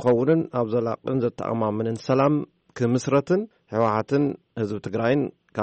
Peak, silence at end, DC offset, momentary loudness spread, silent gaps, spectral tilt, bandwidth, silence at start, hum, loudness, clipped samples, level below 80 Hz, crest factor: -8 dBFS; 0 s; under 0.1%; 8 LU; none; -7.5 dB/octave; 8.4 kHz; 0 s; none; -24 LUFS; under 0.1%; -62 dBFS; 14 dB